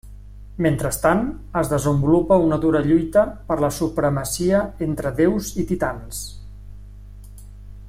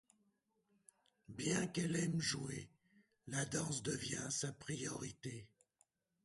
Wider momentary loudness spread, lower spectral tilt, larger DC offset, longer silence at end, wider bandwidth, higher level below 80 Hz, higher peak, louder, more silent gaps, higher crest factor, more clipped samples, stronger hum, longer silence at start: second, 9 LU vs 12 LU; first, -6.5 dB/octave vs -4 dB/octave; neither; second, 0 s vs 0.8 s; first, 16 kHz vs 11.5 kHz; first, -38 dBFS vs -72 dBFS; first, -4 dBFS vs -24 dBFS; first, -20 LUFS vs -42 LUFS; neither; about the same, 18 dB vs 20 dB; neither; first, 50 Hz at -35 dBFS vs none; second, 0.05 s vs 1.3 s